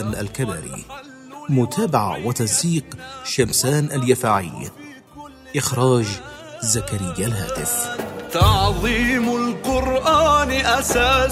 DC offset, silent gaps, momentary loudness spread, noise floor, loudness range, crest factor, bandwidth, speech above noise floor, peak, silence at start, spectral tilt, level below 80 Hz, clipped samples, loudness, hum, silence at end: under 0.1%; none; 18 LU; -41 dBFS; 4 LU; 18 dB; 16 kHz; 21 dB; -2 dBFS; 0 s; -4 dB/octave; -34 dBFS; under 0.1%; -19 LUFS; none; 0 s